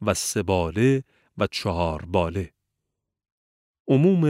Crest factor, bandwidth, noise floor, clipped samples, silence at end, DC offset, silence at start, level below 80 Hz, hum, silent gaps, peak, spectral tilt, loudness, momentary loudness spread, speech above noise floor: 18 dB; 16 kHz; -82 dBFS; under 0.1%; 0 s; under 0.1%; 0 s; -46 dBFS; none; 3.32-3.74 s, 3.80-3.85 s; -6 dBFS; -6 dB/octave; -24 LUFS; 13 LU; 60 dB